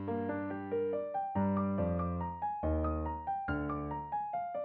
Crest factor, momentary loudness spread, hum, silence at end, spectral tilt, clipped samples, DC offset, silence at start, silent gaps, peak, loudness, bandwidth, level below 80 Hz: 14 dB; 5 LU; none; 0 s; -8.5 dB/octave; under 0.1%; under 0.1%; 0 s; none; -22 dBFS; -36 LUFS; 4.3 kHz; -46 dBFS